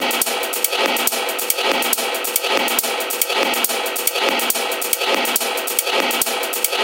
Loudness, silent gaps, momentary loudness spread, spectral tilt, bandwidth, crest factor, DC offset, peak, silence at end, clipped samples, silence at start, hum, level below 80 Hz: -18 LUFS; none; 2 LU; 1 dB/octave; over 20 kHz; 20 dB; under 0.1%; 0 dBFS; 0 s; under 0.1%; 0 s; none; -70 dBFS